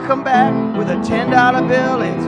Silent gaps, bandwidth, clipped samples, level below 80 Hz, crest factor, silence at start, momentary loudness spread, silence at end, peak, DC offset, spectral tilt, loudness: none; 10.5 kHz; under 0.1%; -46 dBFS; 14 dB; 0 s; 6 LU; 0 s; 0 dBFS; under 0.1%; -6.5 dB/octave; -15 LUFS